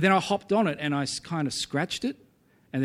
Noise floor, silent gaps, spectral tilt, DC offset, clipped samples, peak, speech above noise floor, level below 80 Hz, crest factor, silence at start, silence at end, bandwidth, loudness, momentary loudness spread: -57 dBFS; none; -4.5 dB/octave; under 0.1%; under 0.1%; -8 dBFS; 31 dB; -64 dBFS; 20 dB; 0 s; 0 s; 15 kHz; -28 LUFS; 9 LU